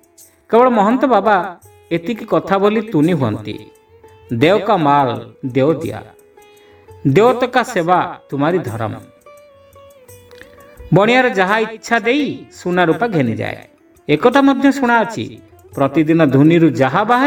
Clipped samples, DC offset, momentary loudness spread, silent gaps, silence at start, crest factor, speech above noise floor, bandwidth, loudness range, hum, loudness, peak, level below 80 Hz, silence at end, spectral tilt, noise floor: under 0.1%; under 0.1%; 14 LU; none; 0.5 s; 16 dB; 33 dB; 17.5 kHz; 4 LU; none; -15 LUFS; 0 dBFS; -52 dBFS; 0 s; -6.5 dB/octave; -48 dBFS